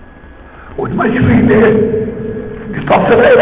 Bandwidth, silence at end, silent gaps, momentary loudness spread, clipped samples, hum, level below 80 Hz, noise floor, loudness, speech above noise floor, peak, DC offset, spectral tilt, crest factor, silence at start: 4 kHz; 0 s; none; 15 LU; under 0.1%; none; -32 dBFS; -35 dBFS; -11 LUFS; 25 dB; 0 dBFS; under 0.1%; -11 dB/octave; 10 dB; 0 s